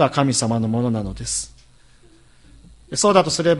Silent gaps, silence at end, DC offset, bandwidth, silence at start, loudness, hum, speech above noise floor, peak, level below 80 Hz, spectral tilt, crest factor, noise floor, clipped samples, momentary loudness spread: none; 0 s; under 0.1%; 11.5 kHz; 0 s; -20 LUFS; none; 31 dB; 0 dBFS; -44 dBFS; -4.5 dB/octave; 20 dB; -50 dBFS; under 0.1%; 10 LU